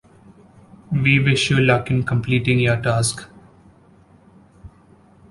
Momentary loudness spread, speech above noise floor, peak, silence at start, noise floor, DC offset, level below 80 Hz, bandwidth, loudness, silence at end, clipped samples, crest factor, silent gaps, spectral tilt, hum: 6 LU; 33 dB; -2 dBFS; 0.9 s; -51 dBFS; under 0.1%; -46 dBFS; 11.5 kHz; -18 LUFS; 0.65 s; under 0.1%; 18 dB; none; -5 dB/octave; none